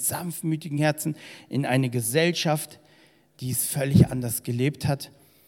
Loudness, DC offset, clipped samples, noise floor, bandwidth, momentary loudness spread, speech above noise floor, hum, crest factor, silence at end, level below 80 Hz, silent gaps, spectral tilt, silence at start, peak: -25 LUFS; under 0.1%; under 0.1%; -58 dBFS; 17.5 kHz; 11 LU; 33 dB; none; 22 dB; 0.4 s; -52 dBFS; none; -5 dB/octave; 0 s; -4 dBFS